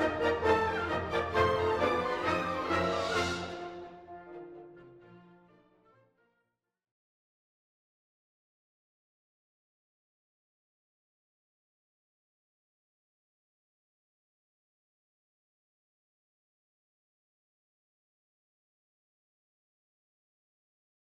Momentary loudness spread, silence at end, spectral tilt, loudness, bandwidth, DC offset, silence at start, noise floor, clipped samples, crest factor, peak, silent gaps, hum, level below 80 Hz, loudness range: 20 LU; 15.95 s; -5 dB/octave; -31 LUFS; 14 kHz; under 0.1%; 0 s; -86 dBFS; under 0.1%; 24 dB; -14 dBFS; none; none; -60 dBFS; 22 LU